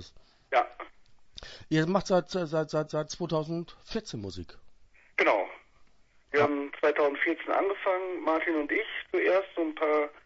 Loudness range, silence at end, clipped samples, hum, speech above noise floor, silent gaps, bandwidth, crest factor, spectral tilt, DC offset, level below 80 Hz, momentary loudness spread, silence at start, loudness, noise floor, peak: 4 LU; 0.15 s; under 0.1%; none; 30 dB; none; 8 kHz; 20 dB; -5.5 dB/octave; under 0.1%; -60 dBFS; 13 LU; 0 s; -29 LUFS; -59 dBFS; -10 dBFS